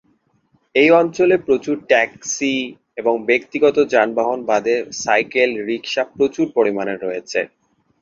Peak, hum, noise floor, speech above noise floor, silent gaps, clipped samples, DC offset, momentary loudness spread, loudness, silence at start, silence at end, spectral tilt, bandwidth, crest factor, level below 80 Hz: -2 dBFS; none; -62 dBFS; 44 dB; none; under 0.1%; under 0.1%; 9 LU; -18 LUFS; 0.75 s; 0.55 s; -3.5 dB/octave; 7.6 kHz; 16 dB; -62 dBFS